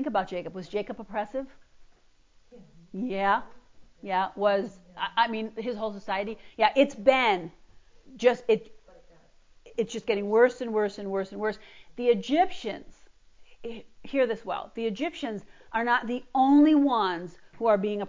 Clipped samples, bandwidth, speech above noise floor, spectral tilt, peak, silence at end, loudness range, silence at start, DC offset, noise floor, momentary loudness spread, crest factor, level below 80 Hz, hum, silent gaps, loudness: under 0.1%; 7.6 kHz; 33 dB; -5.5 dB/octave; -6 dBFS; 0 s; 7 LU; 0 s; under 0.1%; -59 dBFS; 16 LU; 20 dB; -62 dBFS; none; none; -27 LUFS